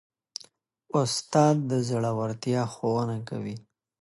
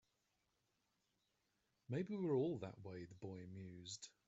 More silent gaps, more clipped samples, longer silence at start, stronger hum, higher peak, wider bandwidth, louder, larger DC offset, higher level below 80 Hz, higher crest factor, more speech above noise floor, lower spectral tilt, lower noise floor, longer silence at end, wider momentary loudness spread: neither; neither; second, 0.95 s vs 1.9 s; neither; first, -8 dBFS vs -30 dBFS; first, 11.5 kHz vs 8 kHz; first, -27 LUFS vs -47 LUFS; neither; first, -66 dBFS vs -84 dBFS; about the same, 20 dB vs 20 dB; second, 31 dB vs 40 dB; about the same, -6 dB/octave vs -7 dB/octave; second, -57 dBFS vs -86 dBFS; first, 0.4 s vs 0.2 s; first, 19 LU vs 14 LU